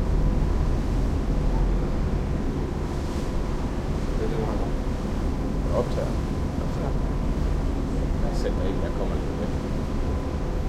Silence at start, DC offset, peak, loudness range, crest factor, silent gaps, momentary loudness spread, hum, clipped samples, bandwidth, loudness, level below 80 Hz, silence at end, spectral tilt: 0 s; under 0.1%; -12 dBFS; 1 LU; 14 dB; none; 3 LU; none; under 0.1%; 11.5 kHz; -28 LUFS; -26 dBFS; 0 s; -7.5 dB/octave